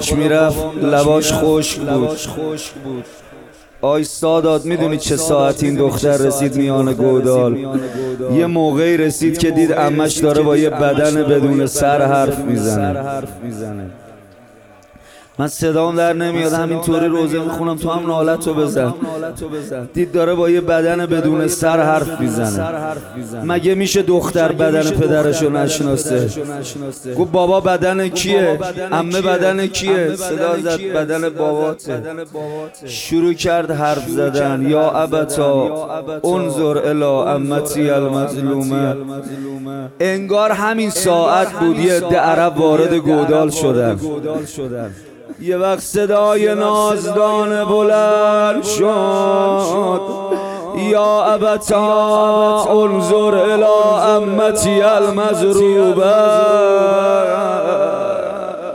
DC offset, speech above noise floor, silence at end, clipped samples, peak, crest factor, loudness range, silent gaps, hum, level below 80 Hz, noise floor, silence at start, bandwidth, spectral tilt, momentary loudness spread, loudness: under 0.1%; 29 dB; 0 s; under 0.1%; -2 dBFS; 14 dB; 6 LU; none; none; -44 dBFS; -44 dBFS; 0 s; 18 kHz; -5 dB/octave; 11 LU; -15 LUFS